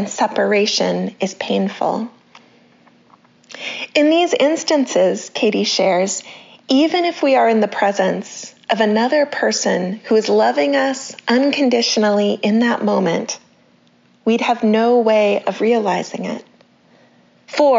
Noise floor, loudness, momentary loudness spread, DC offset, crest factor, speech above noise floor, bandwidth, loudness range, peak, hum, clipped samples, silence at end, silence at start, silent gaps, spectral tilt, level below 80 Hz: -54 dBFS; -17 LUFS; 12 LU; under 0.1%; 16 dB; 38 dB; 7.6 kHz; 4 LU; -2 dBFS; none; under 0.1%; 0 s; 0 s; none; -3 dB/octave; -72 dBFS